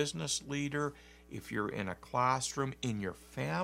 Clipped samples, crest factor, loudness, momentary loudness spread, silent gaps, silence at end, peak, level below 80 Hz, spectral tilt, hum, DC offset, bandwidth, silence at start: under 0.1%; 20 dB; -36 LUFS; 9 LU; none; 0 s; -16 dBFS; -62 dBFS; -4 dB/octave; none; under 0.1%; 16 kHz; 0 s